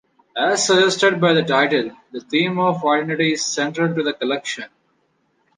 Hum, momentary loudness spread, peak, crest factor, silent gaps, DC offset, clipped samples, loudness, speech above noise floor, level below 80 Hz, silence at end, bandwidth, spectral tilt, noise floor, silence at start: none; 14 LU; -2 dBFS; 18 dB; none; under 0.1%; under 0.1%; -18 LUFS; 46 dB; -70 dBFS; 0.9 s; 10 kHz; -3.5 dB/octave; -65 dBFS; 0.35 s